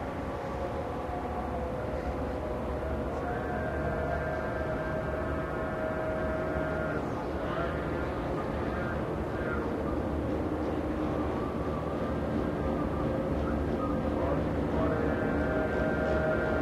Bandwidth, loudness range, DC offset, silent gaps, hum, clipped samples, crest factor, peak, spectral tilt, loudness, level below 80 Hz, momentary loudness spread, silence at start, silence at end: 13 kHz; 3 LU; under 0.1%; none; none; under 0.1%; 16 dB; -16 dBFS; -8 dB/octave; -32 LUFS; -40 dBFS; 5 LU; 0 s; 0 s